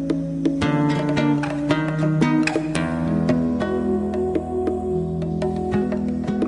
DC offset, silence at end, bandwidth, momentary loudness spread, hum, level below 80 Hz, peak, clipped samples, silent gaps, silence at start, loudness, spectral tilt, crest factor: under 0.1%; 0 s; 11 kHz; 4 LU; none; -42 dBFS; -4 dBFS; under 0.1%; none; 0 s; -22 LUFS; -7.5 dB/octave; 18 dB